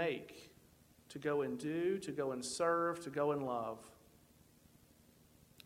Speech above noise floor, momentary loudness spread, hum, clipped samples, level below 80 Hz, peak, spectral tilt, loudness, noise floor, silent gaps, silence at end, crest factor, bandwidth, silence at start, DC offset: 28 dB; 18 LU; none; under 0.1%; -74 dBFS; -22 dBFS; -5 dB/octave; -38 LUFS; -66 dBFS; none; 1.75 s; 18 dB; 16.5 kHz; 0 s; under 0.1%